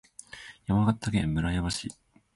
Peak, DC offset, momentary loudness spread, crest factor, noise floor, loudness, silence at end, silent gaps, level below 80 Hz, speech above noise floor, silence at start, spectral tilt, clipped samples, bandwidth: -14 dBFS; under 0.1%; 18 LU; 16 dB; -47 dBFS; -28 LUFS; 0.45 s; none; -44 dBFS; 20 dB; 0.35 s; -5.5 dB/octave; under 0.1%; 11.5 kHz